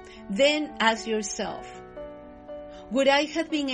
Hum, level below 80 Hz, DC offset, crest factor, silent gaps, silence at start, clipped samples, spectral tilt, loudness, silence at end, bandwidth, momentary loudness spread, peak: none; -56 dBFS; under 0.1%; 20 dB; none; 0 s; under 0.1%; -3 dB/octave; -25 LUFS; 0 s; 10 kHz; 20 LU; -6 dBFS